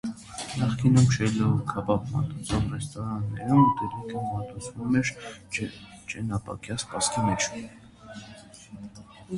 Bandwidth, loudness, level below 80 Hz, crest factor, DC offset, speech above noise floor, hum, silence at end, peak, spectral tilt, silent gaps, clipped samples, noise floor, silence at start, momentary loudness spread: 11.5 kHz; -27 LUFS; -48 dBFS; 20 dB; under 0.1%; 21 dB; none; 0 s; -8 dBFS; -5.5 dB/octave; none; under 0.1%; -47 dBFS; 0.05 s; 23 LU